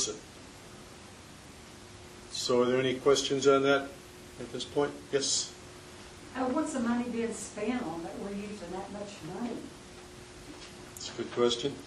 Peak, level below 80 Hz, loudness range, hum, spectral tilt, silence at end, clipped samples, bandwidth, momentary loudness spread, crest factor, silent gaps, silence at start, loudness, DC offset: -12 dBFS; -60 dBFS; 10 LU; none; -3.5 dB/octave; 0 s; under 0.1%; 12.5 kHz; 22 LU; 22 dB; none; 0 s; -31 LUFS; under 0.1%